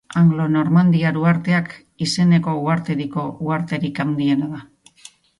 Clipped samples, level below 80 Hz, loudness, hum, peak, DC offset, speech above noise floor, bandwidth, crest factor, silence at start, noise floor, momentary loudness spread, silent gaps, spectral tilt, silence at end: under 0.1%; -58 dBFS; -19 LUFS; none; -4 dBFS; under 0.1%; 29 dB; 11.5 kHz; 14 dB; 0.1 s; -47 dBFS; 10 LU; none; -7 dB/octave; 0.8 s